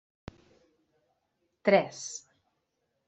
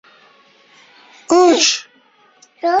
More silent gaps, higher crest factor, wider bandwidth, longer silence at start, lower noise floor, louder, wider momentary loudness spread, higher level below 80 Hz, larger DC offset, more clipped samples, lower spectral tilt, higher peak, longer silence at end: neither; first, 26 dB vs 18 dB; about the same, 8.2 kHz vs 8 kHz; first, 1.65 s vs 1.3 s; first, -79 dBFS vs -53 dBFS; second, -28 LUFS vs -14 LUFS; first, 26 LU vs 12 LU; about the same, -68 dBFS vs -64 dBFS; neither; neither; first, -4 dB/octave vs -0.5 dB/octave; second, -8 dBFS vs -2 dBFS; first, 0.9 s vs 0 s